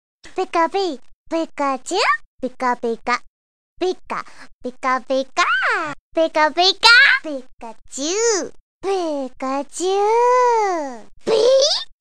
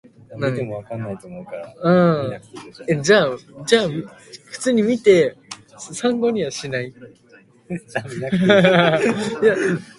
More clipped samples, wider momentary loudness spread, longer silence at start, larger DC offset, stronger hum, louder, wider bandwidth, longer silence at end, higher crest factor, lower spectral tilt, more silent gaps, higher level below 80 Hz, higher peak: neither; about the same, 17 LU vs 19 LU; second, 0.15 s vs 0.3 s; first, 1% vs under 0.1%; neither; about the same, -18 LUFS vs -19 LUFS; first, 15 kHz vs 11.5 kHz; second, 0 s vs 0.15 s; about the same, 18 dB vs 20 dB; second, -1 dB/octave vs -5.5 dB/octave; first, 1.14-1.26 s, 2.26-2.39 s, 3.27-3.76 s, 4.53-4.61 s, 5.99-6.12 s, 8.60-8.81 s vs none; about the same, -56 dBFS vs -58 dBFS; about the same, 0 dBFS vs 0 dBFS